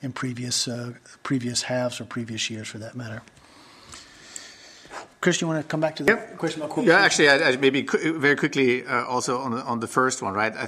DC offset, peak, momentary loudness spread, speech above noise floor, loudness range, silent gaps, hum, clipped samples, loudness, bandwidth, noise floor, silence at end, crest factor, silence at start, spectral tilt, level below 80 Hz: under 0.1%; -4 dBFS; 22 LU; 27 dB; 11 LU; none; none; under 0.1%; -23 LUFS; 15.5 kHz; -50 dBFS; 0 s; 20 dB; 0 s; -3.5 dB/octave; -64 dBFS